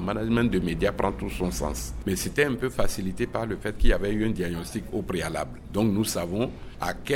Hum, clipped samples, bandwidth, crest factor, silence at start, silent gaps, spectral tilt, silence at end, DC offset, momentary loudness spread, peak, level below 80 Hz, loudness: none; under 0.1%; 17 kHz; 20 dB; 0 s; none; -5.5 dB/octave; 0 s; under 0.1%; 8 LU; -6 dBFS; -32 dBFS; -28 LUFS